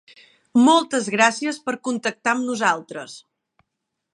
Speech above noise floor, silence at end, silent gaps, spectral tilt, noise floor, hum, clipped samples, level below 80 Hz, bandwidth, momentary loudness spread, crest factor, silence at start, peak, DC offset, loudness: 60 dB; 0.95 s; none; -3 dB/octave; -80 dBFS; none; under 0.1%; -76 dBFS; 11 kHz; 13 LU; 22 dB; 0.55 s; 0 dBFS; under 0.1%; -20 LUFS